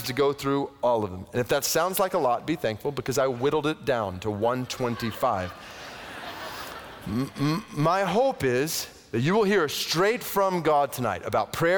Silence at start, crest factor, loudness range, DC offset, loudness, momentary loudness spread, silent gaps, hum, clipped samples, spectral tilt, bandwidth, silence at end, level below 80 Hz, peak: 0 s; 14 dB; 6 LU; under 0.1%; -26 LUFS; 13 LU; none; none; under 0.1%; -4.5 dB/octave; over 20 kHz; 0 s; -56 dBFS; -12 dBFS